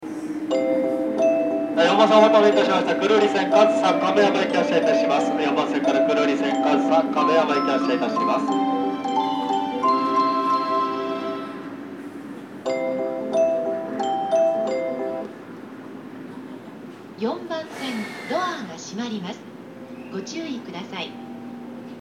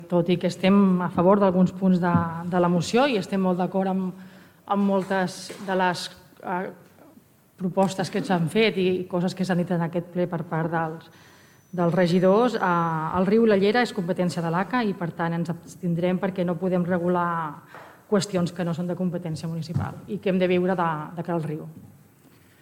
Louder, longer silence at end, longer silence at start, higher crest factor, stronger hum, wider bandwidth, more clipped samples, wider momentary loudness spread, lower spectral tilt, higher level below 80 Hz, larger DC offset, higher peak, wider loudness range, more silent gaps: first, -21 LUFS vs -24 LUFS; second, 0 s vs 0.75 s; about the same, 0 s vs 0 s; about the same, 20 dB vs 18 dB; neither; second, 11 kHz vs 14.5 kHz; neither; first, 19 LU vs 12 LU; second, -5 dB/octave vs -7 dB/octave; second, -74 dBFS vs -62 dBFS; neither; first, -2 dBFS vs -6 dBFS; first, 13 LU vs 6 LU; neither